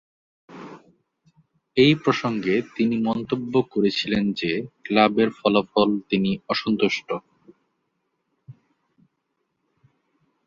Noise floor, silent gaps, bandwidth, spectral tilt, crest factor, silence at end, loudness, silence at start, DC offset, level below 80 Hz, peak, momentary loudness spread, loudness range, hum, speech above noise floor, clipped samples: -76 dBFS; none; 7.4 kHz; -6.5 dB/octave; 22 dB; 1.95 s; -22 LUFS; 0.5 s; under 0.1%; -60 dBFS; -2 dBFS; 11 LU; 7 LU; none; 54 dB; under 0.1%